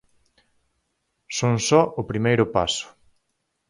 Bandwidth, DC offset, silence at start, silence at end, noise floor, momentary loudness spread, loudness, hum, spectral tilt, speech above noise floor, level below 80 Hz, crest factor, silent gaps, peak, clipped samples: 11.5 kHz; under 0.1%; 1.3 s; 0.85 s; -75 dBFS; 11 LU; -22 LUFS; none; -4.5 dB/octave; 54 dB; -52 dBFS; 22 dB; none; -2 dBFS; under 0.1%